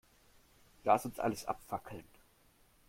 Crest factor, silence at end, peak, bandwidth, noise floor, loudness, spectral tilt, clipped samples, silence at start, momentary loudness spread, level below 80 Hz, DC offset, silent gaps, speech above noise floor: 26 dB; 0.9 s; -14 dBFS; 16.5 kHz; -68 dBFS; -36 LUFS; -5 dB/octave; under 0.1%; 0.85 s; 16 LU; -66 dBFS; under 0.1%; none; 32 dB